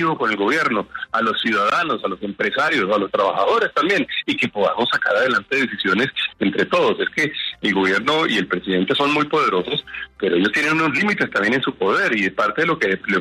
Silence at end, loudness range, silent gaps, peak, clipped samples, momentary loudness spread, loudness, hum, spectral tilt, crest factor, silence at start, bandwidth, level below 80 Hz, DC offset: 0 s; 1 LU; none; -6 dBFS; under 0.1%; 4 LU; -19 LUFS; none; -4.5 dB/octave; 14 dB; 0 s; 13.5 kHz; -58 dBFS; under 0.1%